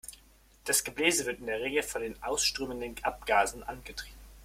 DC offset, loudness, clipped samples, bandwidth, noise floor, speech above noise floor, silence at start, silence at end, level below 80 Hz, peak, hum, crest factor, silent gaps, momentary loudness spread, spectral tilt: under 0.1%; -30 LUFS; under 0.1%; 16.5 kHz; -60 dBFS; 28 dB; 0.05 s; 0 s; -54 dBFS; -10 dBFS; none; 22 dB; none; 15 LU; -1.5 dB/octave